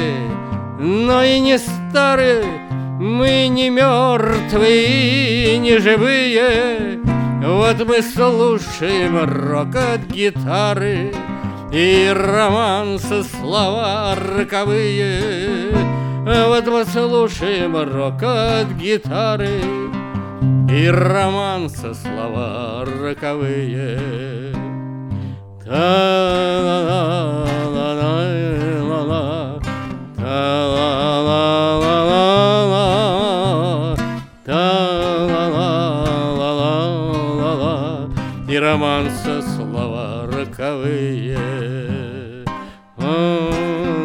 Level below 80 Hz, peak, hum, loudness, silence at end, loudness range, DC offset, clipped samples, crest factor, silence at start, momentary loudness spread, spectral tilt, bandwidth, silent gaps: -38 dBFS; 0 dBFS; none; -17 LUFS; 0 s; 7 LU; under 0.1%; under 0.1%; 16 dB; 0 s; 12 LU; -6 dB/octave; 17 kHz; none